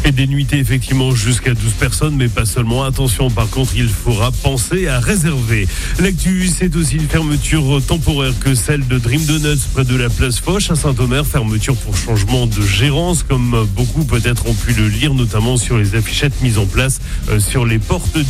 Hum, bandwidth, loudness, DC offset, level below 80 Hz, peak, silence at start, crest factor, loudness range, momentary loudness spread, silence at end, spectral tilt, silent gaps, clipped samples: none; 16 kHz; -15 LUFS; under 0.1%; -22 dBFS; 0 dBFS; 0 s; 14 dB; 1 LU; 2 LU; 0 s; -5 dB/octave; none; under 0.1%